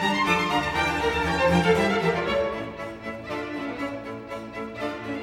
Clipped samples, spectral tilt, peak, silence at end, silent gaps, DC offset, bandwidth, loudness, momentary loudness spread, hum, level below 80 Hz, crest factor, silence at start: under 0.1%; -5 dB/octave; -8 dBFS; 0 s; none; under 0.1%; 16.5 kHz; -25 LUFS; 14 LU; none; -46 dBFS; 18 dB; 0 s